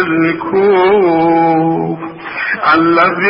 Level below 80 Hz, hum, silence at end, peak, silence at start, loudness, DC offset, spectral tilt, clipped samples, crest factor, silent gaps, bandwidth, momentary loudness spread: -50 dBFS; none; 0 s; 0 dBFS; 0 s; -11 LUFS; under 0.1%; -9.5 dB/octave; under 0.1%; 12 dB; none; 5.6 kHz; 10 LU